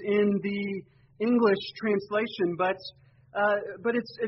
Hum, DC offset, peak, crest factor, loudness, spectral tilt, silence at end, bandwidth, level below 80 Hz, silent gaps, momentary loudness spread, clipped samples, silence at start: none; under 0.1%; -10 dBFS; 18 dB; -28 LUFS; -4.5 dB/octave; 0 s; 6 kHz; -68 dBFS; none; 12 LU; under 0.1%; 0 s